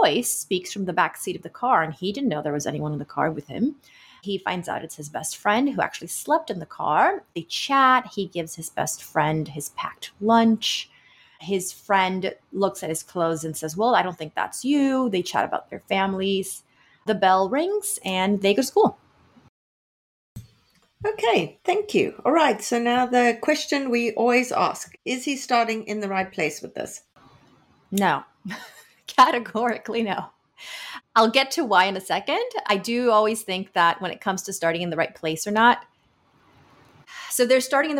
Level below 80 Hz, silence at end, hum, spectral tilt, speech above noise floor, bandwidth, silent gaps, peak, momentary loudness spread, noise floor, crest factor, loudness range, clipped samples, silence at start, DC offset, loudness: -66 dBFS; 0 s; none; -3.5 dB/octave; 39 dB; 17 kHz; 19.49-20.36 s; -6 dBFS; 12 LU; -62 dBFS; 18 dB; 5 LU; under 0.1%; 0 s; under 0.1%; -23 LUFS